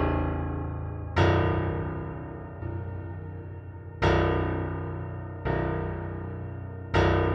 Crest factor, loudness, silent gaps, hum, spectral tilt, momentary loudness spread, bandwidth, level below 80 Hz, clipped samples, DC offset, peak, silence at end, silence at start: 18 dB; -29 LUFS; none; none; -8 dB/octave; 15 LU; 7 kHz; -38 dBFS; under 0.1%; under 0.1%; -10 dBFS; 0 s; 0 s